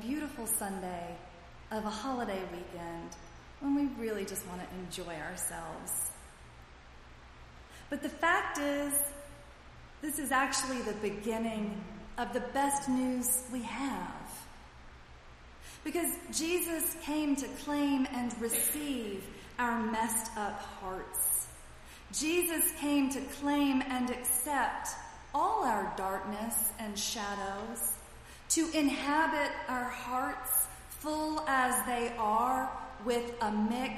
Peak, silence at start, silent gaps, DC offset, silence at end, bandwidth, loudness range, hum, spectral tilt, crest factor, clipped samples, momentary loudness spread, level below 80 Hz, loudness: -14 dBFS; 0 s; none; under 0.1%; 0 s; 15.5 kHz; 6 LU; none; -2.5 dB/octave; 20 dB; under 0.1%; 14 LU; -56 dBFS; -33 LUFS